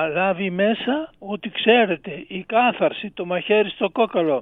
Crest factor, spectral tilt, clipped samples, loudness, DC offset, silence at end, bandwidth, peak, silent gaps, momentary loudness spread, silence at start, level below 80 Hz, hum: 18 dB; -8.5 dB/octave; under 0.1%; -21 LUFS; under 0.1%; 0 s; 4 kHz; -2 dBFS; none; 12 LU; 0 s; -60 dBFS; none